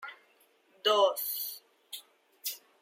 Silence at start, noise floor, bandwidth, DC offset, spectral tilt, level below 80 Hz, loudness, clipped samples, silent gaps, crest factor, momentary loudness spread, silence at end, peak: 0 s; -67 dBFS; 16.5 kHz; under 0.1%; 0.5 dB/octave; under -90 dBFS; -30 LUFS; under 0.1%; none; 20 dB; 20 LU; 0.25 s; -14 dBFS